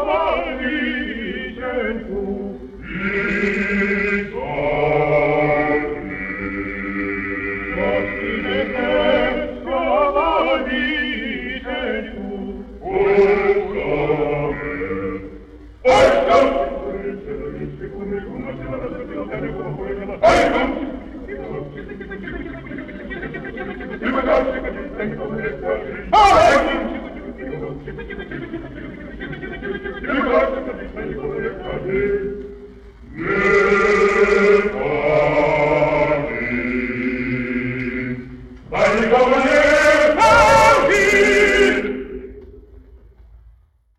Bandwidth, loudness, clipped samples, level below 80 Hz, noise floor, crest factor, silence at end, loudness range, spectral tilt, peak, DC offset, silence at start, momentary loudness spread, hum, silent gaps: 13 kHz; -18 LUFS; under 0.1%; -38 dBFS; -52 dBFS; 18 dB; 0.5 s; 10 LU; -5 dB/octave; -2 dBFS; under 0.1%; 0 s; 17 LU; none; none